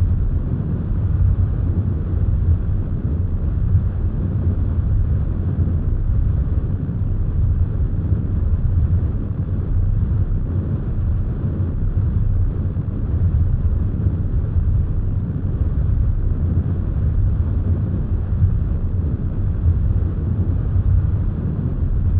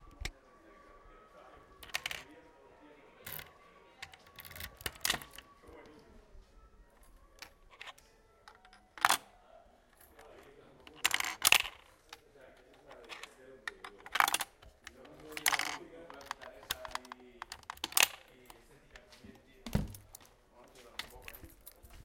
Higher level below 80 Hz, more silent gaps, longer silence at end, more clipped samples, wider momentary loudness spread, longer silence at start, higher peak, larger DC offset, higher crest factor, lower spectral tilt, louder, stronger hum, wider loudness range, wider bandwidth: first, -22 dBFS vs -58 dBFS; neither; about the same, 0 s vs 0.05 s; neither; second, 4 LU vs 27 LU; about the same, 0 s vs 0 s; about the same, -6 dBFS vs -6 dBFS; first, 0.3% vs under 0.1%; second, 12 dB vs 36 dB; first, -13.5 dB/octave vs -1 dB/octave; first, -21 LUFS vs -34 LUFS; neither; second, 1 LU vs 13 LU; second, 2.1 kHz vs 17 kHz